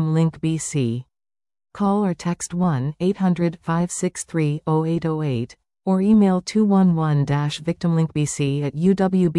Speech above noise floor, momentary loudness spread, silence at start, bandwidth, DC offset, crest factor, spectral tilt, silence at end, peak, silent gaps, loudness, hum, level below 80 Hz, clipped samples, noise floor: over 70 dB; 8 LU; 0 s; 12 kHz; under 0.1%; 14 dB; -6.5 dB/octave; 0 s; -8 dBFS; none; -21 LUFS; none; -52 dBFS; under 0.1%; under -90 dBFS